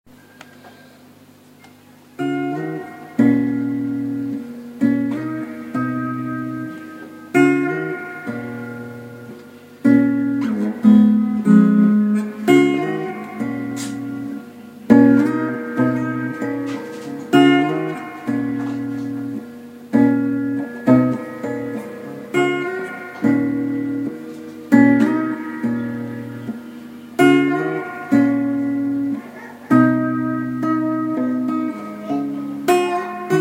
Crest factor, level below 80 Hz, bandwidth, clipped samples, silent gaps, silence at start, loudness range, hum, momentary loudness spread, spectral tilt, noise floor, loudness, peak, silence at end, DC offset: 18 dB; -62 dBFS; 16 kHz; under 0.1%; none; 0.65 s; 7 LU; none; 17 LU; -7 dB/octave; -47 dBFS; -19 LUFS; 0 dBFS; 0 s; under 0.1%